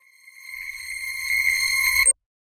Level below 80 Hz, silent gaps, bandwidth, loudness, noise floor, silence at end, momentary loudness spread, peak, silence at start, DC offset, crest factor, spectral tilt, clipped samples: -52 dBFS; none; 16 kHz; -20 LUFS; -46 dBFS; 0.4 s; 17 LU; -8 dBFS; 0.25 s; under 0.1%; 18 dB; 3.5 dB/octave; under 0.1%